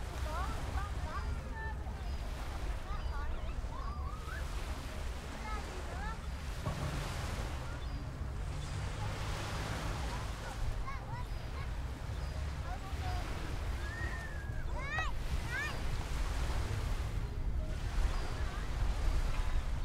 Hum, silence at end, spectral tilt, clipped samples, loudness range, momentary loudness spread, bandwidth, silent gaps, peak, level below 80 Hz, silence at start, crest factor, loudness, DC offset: none; 0 s; -5 dB/octave; under 0.1%; 3 LU; 5 LU; 15.5 kHz; none; -20 dBFS; -38 dBFS; 0 s; 18 dB; -40 LUFS; under 0.1%